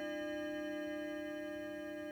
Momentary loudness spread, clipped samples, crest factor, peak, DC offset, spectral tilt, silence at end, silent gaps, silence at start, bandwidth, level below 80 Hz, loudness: 3 LU; under 0.1%; 10 dB; -32 dBFS; under 0.1%; -4.5 dB/octave; 0 s; none; 0 s; over 20 kHz; -72 dBFS; -43 LUFS